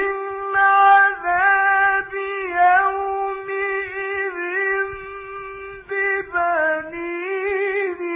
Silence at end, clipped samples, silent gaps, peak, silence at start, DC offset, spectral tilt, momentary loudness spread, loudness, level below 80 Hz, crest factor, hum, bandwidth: 0 s; under 0.1%; none; -4 dBFS; 0 s; under 0.1%; -6.5 dB/octave; 13 LU; -19 LUFS; -54 dBFS; 16 dB; none; 3.9 kHz